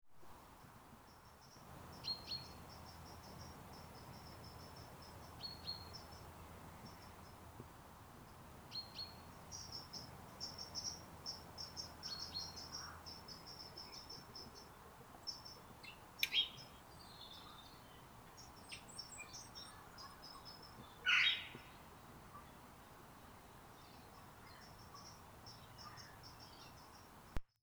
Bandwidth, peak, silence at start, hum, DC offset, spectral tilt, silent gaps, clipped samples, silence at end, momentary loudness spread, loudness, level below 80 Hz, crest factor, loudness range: over 20 kHz; -18 dBFS; 0.05 s; none; under 0.1%; -2 dB/octave; none; under 0.1%; 0.2 s; 15 LU; -47 LUFS; -66 dBFS; 32 dB; 16 LU